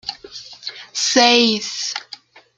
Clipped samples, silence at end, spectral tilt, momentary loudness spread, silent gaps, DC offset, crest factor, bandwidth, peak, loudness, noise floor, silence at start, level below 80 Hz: under 0.1%; 0.45 s; -1.5 dB/octave; 23 LU; none; under 0.1%; 20 dB; 9.4 kHz; 0 dBFS; -16 LUFS; -42 dBFS; 0.05 s; -64 dBFS